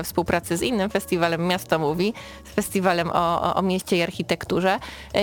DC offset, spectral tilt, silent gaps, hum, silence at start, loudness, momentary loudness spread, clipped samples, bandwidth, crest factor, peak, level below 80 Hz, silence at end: under 0.1%; -5 dB/octave; none; none; 0 s; -23 LUFS; 5 LU; under 0.1%; 18 kHz; 18 dB; -6 dBFS; -48 dBFS; 0 s